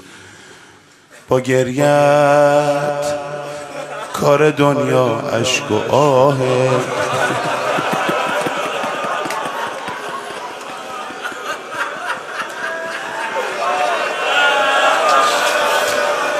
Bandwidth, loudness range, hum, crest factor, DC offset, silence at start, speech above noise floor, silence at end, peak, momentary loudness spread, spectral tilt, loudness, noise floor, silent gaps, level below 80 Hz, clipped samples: 14.5 kHz; 9 LU; none; 16 dB; under 0.1%; 0.05 s; 31 dB; 0 s; 0 dBFS; 13 LU; -4 dB/octave; -16 LUFS; -45 dBFS; none; -58 dBFS; under 0.1%